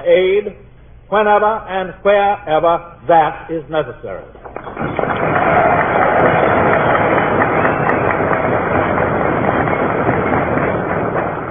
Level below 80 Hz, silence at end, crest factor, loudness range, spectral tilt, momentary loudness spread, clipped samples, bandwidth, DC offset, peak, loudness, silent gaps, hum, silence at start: -40 dBFS; 0 s; 14 dB; 4 LU; -10.5 dB/octave; 10 LU; under 0.1%; 3.7 kHz; under 0.1%; 0 dBFS; -15 LUFS; none; none; 0 s